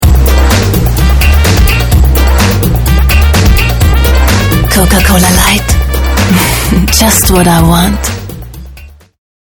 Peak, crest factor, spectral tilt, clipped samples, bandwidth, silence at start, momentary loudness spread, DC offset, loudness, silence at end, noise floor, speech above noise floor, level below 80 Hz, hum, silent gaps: 0 dBFS; 6 dB; -4.5 dB/octave; 2%; over 20 kHz; 0 s; 5 LU; under 0.1%; -7 LUFS; 0.6 s; -31 dBFS; 25 dB; -10 dBFS; none; none